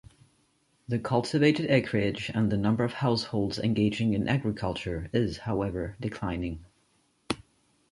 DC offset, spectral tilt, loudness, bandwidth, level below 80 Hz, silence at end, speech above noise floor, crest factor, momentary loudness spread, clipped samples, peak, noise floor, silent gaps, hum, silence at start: under 0.1%; -7 dB/octave; -28 LUFS; 11.5 kHz; -50 dBFS; 0.55 s; 42 dB; 20 dB; 10 LU; under 0.1%; -8 dBFS; -69 dBFS; none; none; 0.9 s